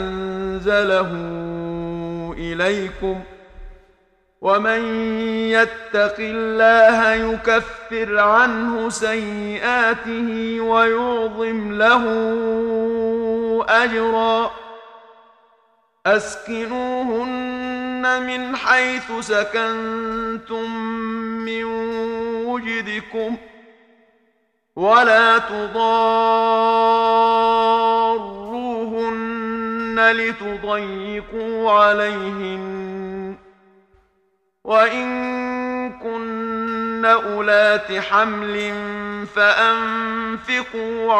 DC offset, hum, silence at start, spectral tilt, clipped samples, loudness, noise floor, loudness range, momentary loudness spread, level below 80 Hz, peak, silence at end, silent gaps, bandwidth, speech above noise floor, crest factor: under 0.1%; none; 0 s; -4.5 dB/octave; under 0.1%; -19 LUFS; -66 dBFS; 8 LU; 12 LU; -48 dBFS; -2 dBFS; 0 s; none; 10.5 kHz; 47 dB; 18 dB